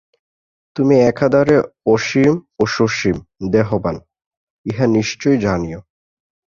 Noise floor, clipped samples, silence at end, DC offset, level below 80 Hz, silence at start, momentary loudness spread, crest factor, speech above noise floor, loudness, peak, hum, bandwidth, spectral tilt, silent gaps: under -90 dBFS; under 0.1%; 0.65 s; under 0.1%; -44 dBFS; 0.75 s; 14 LU; 16 dB; over 75 dB; -16 LUFS; -2 dBFS; none; 7.4 kHz; -6.5 dB/octave; 4.26-4.31 s, 4.37-4.64 s